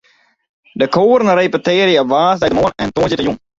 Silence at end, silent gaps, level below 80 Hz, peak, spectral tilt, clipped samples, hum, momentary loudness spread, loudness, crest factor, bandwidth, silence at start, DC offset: 0.2 s; none; -44 dBFS; 0 dBFS; -5.5 dB/octave; under 0.1%; none; 6 LU; -13 LUFS; 14 dB; 7.8 kHz; 0.75 s; under 0.1%